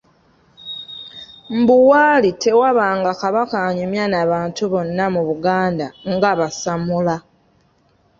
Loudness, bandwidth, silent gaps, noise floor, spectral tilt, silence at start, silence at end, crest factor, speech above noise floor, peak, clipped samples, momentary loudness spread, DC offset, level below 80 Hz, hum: -17 LUFS; 7.6 kHz; none; -58 dBFS; -5.5 dB/octave; 0.65 s; 1 s; 16 dB; 42 dB; -2 dBFS; under 0.1%; 17 LU; under 0.1%; -54 dBFS; none